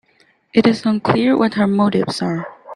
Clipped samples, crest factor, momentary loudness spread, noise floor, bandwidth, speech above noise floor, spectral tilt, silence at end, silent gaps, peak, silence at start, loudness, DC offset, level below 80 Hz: under 0.1%; 16 dB; 7 LU; -57 dBFS; 10.5 kHz; 41 dB; -6.5 dB/octave; 0 s; none; 0 dBFS; 0.55 s; -17 LUFS; under 0.1%; -54 dBFS